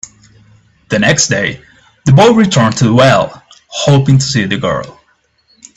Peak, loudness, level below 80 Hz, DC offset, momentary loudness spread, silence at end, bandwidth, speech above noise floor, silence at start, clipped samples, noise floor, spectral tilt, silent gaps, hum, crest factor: 0 dBFS; -10 LUFS; -44 dBFS; under 0.1%; 13 LU; 0.85 s; 8.4 kHz; 46 dB; 0.9 s; under 0.1%; -55 dBFS; -5 dB/octave; none; none; 12 dB